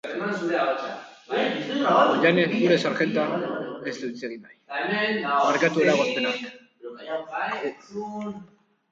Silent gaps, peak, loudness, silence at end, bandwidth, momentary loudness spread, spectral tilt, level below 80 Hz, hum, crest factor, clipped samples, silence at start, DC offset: none; -6 dBFS; -24 LUFS; 0.45 s; 7.8 kHz; 16 LU; -5 dB/octave; -72 dBFS; none; 20 dB; under 0.1%; 0.05 s; under 0.1%